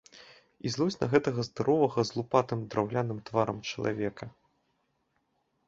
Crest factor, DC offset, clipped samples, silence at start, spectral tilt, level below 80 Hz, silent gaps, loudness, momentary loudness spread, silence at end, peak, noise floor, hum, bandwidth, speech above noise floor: 22 dB; under 0.1%; under 0.1%; 0.15 s; -6 dB/octave; -64 dBFS; none; -30 LUFS; 9 LU; 1.4 s; -8 dBFS; -76 dBFS; none; 7.8 kHz; 46 dB